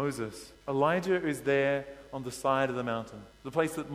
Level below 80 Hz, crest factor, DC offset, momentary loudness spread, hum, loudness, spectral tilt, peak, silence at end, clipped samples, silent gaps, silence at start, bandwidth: -62 dBFS; 18 dB; under 0.1%; 14 LU; none; -31 LUFS; -5.5 dB/octave; -14 dBFS; 0 s; under 0.1%; none; 0 s; 16 kHz